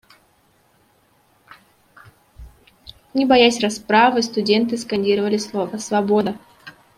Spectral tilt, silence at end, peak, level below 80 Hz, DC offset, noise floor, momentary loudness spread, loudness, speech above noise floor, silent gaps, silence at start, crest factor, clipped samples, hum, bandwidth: -4 dB/octave; 0.25 s; -2 dBFS; -54 dBFS; under 0.1%; -59 dBFS; 11 LU; -18 LUFS; 41 dB; none; 2.4 s; 20 dB; under 0.1%; none; 15 kHz